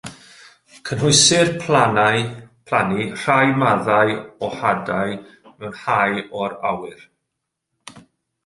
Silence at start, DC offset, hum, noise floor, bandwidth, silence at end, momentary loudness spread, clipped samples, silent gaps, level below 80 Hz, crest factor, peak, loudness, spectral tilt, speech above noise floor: 0.05 s; under 0.1%; none; -79 dBFS; 11.5 kHz; 0.45 s; 16 LU; under 0.1%; none; -54 dBFS; 18 dB; -2 dBFS; -18 LUFS; -3.5 dB/octave; 60 dB